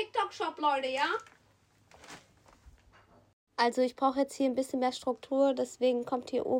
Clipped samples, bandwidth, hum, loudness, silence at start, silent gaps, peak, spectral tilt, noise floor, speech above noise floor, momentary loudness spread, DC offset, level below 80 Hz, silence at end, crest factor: under 0.1%; 16 kHz; none; -31 LUFS; 0 s; 3.33-3.47 s; -16 dBFS; -3.5 dB/octave; -66 dBFS; 36 dB; 12 LU; under 0.1%; -70 dBFS; 0 s; 16 dB